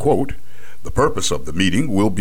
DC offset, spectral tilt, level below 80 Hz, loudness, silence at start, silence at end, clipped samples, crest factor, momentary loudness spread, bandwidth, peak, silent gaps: 10%; -5 dB/octave; -36 dBFS; -20 LUFS; 0 s; 0 s; under 0.1%; 16 dB; 13 LU; 17 kHz; -4 dBFS; none